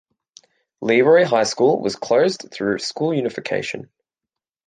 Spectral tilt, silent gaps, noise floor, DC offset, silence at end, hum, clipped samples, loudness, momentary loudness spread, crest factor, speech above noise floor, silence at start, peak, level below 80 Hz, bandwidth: -4.5 dB/octave; none; -86 dBFS; under 0.1%; 0.85 s; none; under 0.1%; -19 LUFS; 11 LU; 16 dB; 68 dB; 0.8 s; -4 dBFS; -66 dBFS; 9.6 kHz